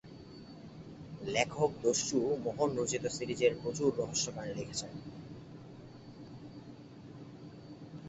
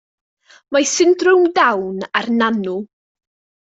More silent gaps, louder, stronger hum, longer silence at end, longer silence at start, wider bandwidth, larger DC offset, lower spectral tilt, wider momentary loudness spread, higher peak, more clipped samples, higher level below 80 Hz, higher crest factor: neither; second, -34 LUFS vs -16 LUFS; neither; second, 0 s vs 0.95 s; second, 0.05 s vs 0.7 s; about the same, 8.2 kHz vs 8 kHz; neither; about the same, -4 dB/octave vs -3 dB/octave; first, 20 LU vs 10 LU; second, -14 dBFS vs -2 dBFS; neither; about the same, -64 dBFS vs -64 dBFS; first, 22 dB vs 16 dB